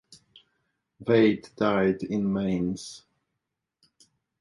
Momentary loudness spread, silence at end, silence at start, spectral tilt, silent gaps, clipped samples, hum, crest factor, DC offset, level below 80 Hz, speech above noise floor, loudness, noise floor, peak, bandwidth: 16 LU; 1.45 s; 1 s; -6.5 dB/octave; none; under 0.1%; none; 20 dB; under 0.1%; -60 dBFS; 59 dB; -26 LUFS; -84 dBFS; -8 dBFS; 11.5 kHz